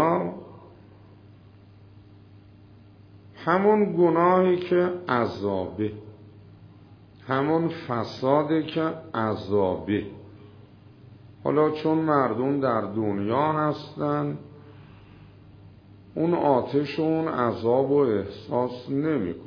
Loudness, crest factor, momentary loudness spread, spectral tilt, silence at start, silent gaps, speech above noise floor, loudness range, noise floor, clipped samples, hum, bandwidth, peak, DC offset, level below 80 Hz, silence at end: -25 LUFS; 20 dB; 9 LU; -9 dB/octave; 0 s; none; 27 dB; 6 LU; -50 dBFS; under 0.1%; none; 5.4 kHz; -6 dBFS; under 0.1%; -62 dBFS; 0 s